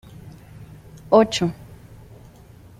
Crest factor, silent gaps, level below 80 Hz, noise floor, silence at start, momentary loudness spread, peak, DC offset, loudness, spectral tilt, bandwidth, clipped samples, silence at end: 22 dB; none; -52 dBFS; -46 dBFS; 0.25 s; 27 LU; -2 dBFS; under 0.1%; -19 LUFS; -5.5 dB/octave; 15.5 kHz; under 0.1%; 1.15 s